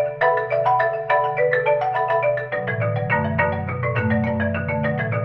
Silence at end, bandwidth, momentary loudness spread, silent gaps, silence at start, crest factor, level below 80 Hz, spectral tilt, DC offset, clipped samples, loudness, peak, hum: 0 s; 5.8 kHz; 4 LU; none; 0 s; 16 dB; -54 dBFS; -9.5 dB/octave; under 0.1%; under 0.1%; -21 LUFS; -6 dBFS; none